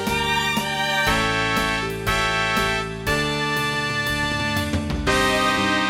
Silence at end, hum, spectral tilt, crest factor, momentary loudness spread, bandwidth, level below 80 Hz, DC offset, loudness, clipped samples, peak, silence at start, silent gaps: 0 s; none; -3.5 dB/octave; 18 dB; 4 LU; 17 kHz; -36 dBFS; under 0.1%; -21 LUFS; under 0.1%; -4 dBFS; 0 s; none